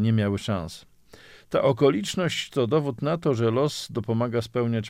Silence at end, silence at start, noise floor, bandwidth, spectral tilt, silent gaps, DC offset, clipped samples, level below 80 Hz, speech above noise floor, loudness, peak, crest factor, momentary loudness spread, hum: 0 s; 0 s; -50 dBFS; 15.5 kHz; -6 dB/octave; none; under 0.1%; under 0.1%; -56 dBFS; 26 dB; -25 LUFS; -8 dBFS; 16 dB; 8 LU; none